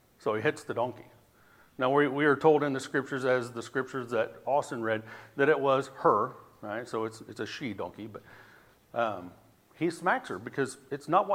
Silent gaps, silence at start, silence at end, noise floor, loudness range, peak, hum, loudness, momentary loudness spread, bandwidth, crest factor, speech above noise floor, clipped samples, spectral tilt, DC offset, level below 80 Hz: none; 0.25 s; 0 s; -60 dBFS; 8 LU; -10 dBFS; none; -30 LUFS; 15 LU; 15.5 kHz; 20 dB; 31 dB; under 0.1%; -5.5 dB/octave; under 0.1%; -74 dBFS